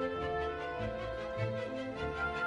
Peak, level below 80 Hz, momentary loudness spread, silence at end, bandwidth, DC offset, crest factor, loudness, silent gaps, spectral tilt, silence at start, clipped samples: -22 dBFS; -52 dBFS; 3 LU; 0 s; 10.5 kHz; under 0.1%; 14 dB; -38 LUFS; none; -6.5 dB/octave; 0 s; under 0.1%